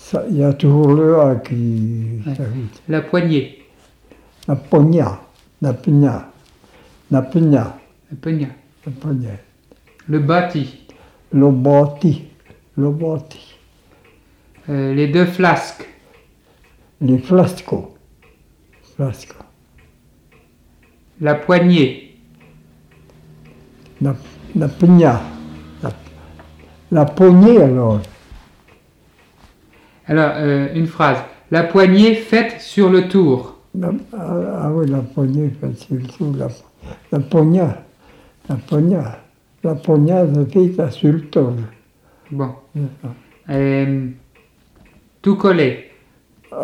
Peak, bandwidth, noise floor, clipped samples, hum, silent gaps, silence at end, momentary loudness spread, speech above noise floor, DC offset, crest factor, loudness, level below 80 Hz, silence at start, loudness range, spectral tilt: -2 dBFS; 10.5 kHz; -52 dBFS; under 0.1%; none; none; 0 s; 17 LU; 38 dB; under 0.1%; 14 dB; -16 LUFS; -50 dBFS; 0.1 s; 8 LU; -8.5 dB/octave